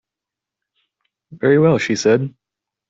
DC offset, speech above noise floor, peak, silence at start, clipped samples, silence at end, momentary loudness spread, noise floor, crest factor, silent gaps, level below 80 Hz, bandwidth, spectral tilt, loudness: under 0.1%; 70 dB; -2 dBFS; 1.3 s; under 0.1%; 0.6 s; 7 LU; -86 dBFS; 16 dB; none; -60 dBFS; 8 kHz; -6 dB/octave; -16 LUFS